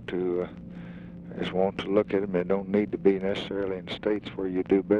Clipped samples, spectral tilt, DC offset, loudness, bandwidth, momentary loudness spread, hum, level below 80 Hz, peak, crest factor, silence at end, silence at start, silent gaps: under 0.1%; -8 dB/octave; under 0.1%; -28 LUFS; 7.4 kHz; 16 LU; none; -56 dBFS; -8 dBFS; 18 dB; 0 s; 0 s; none